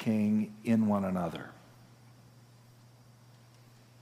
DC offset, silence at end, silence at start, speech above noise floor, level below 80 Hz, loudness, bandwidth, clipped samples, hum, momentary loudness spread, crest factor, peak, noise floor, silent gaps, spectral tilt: under 0.1%; 2.5 s; 0 s; 28 dB; -74 dBFS; -31 LUFS; 14 kHz; under 0.1%; none; 14 LU; 18 dB; -16 dBFS; -58 dBFS; none; -8 dB/octave